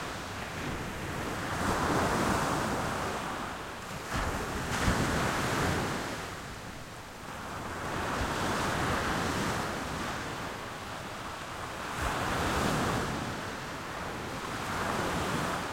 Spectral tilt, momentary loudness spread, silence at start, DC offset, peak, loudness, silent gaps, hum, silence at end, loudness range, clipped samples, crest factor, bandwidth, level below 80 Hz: -4.5 dB/octave; 10 LU; 0 s; under 0.1%; -14 dBFS; -33 LUFS; none; none; 0 s; 3 LU; under 0.1%; 18 dB; 16.5 kHz; -46 dBFS